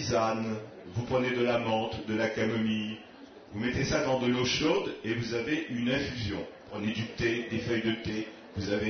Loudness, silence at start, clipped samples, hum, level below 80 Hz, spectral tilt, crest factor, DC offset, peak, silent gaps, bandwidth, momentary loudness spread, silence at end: -31 LUFS; 0 s; under 0.1%; none; -54 dBFS; -5 dB/octave; 16 dB; under 0.1%; -14 dBFS; none; 6.6 kHz; 11 LU; 0 s